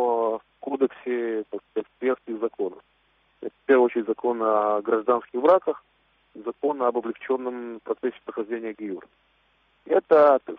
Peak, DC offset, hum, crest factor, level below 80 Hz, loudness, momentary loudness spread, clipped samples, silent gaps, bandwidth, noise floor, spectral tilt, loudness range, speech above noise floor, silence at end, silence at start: -6 dBFS; under 0.1%; none; 18 dB; -72 dBFS; -25 LUFS; 15 LU; under 0.1%; none; 4.8 kHz; -65 dBFS; -4 dB/octave; 6 LU; 41 dB; 0 s; 0 s